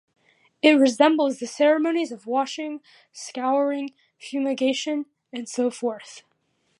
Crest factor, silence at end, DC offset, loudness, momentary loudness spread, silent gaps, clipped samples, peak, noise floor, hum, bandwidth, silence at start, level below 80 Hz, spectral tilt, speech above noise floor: 20 dB; 0.6 s; under 0.1%; -23 LUFS; 18 LU; none; under 0.1%; -2 dBFS; -70 dBFS; none; 11.5 kHz; 0.65 s; -80 dBFS; -3 dB/octave; 47 dB